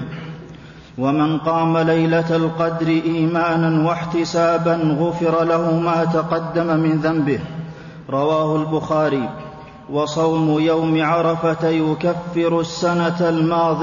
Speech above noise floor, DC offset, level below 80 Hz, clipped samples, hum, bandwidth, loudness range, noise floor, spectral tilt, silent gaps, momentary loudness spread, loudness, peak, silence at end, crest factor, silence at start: 21 dB; under 0.1%; -52 dBFS; under 0.1%; none; 7.4 kHz; 2 LU; -39 dBFS; -7 dB/octave; none; 11 LU; -18 LUFS; -8 dBFS; 0 s; 12 dB; 0 s